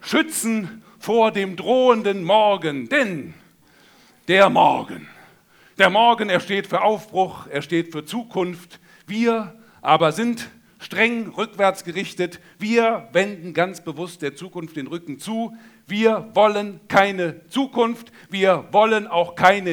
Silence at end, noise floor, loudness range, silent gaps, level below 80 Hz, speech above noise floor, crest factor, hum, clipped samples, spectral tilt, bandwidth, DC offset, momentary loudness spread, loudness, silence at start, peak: 0 s; -53 dBFS; 5 LU; none; -68 dBFS; 33 dB; 20 dB; none; under 0.1%; -4.5 dB/octave; over 20 kHz; under 0.1%; 15 LU; -20 LUFS; 0.05 s; 0 dBFS